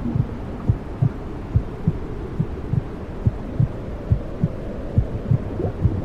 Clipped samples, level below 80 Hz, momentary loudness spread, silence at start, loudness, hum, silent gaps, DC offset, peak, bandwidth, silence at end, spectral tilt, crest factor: under 0.1%; -30 dBFS; 6 LU; 0 s; -25 LUFS; none; none; under 0.1%; -6 dBFS; 6 kHz; 0 s; -10 dB/octave; 16 dB